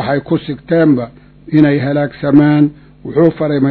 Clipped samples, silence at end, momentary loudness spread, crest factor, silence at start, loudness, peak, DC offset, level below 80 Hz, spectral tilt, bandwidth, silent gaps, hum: 0.3%; 0 s; 8 LU; 12 dB; 0 s; -13 LUFS; 0 dBFS; under 0.1%; -46 dBFS; -11 dB/octave; 4.5 kHz; none; none